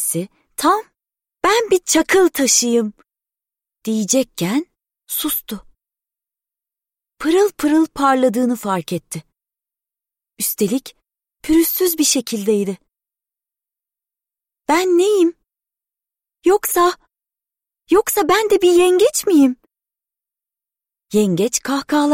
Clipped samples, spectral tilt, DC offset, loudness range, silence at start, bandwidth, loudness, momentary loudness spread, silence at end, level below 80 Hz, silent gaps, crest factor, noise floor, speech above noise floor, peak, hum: under 0.1%; -3.5 dB/octave; under 0.1%; 6 LU; 0 s; 16.5 kHz; -16 LUFS; 12 LU; 0 s; -52 dBFS; none; 16 dB; -89 dBFS; 73 dB; -2 dBFS; none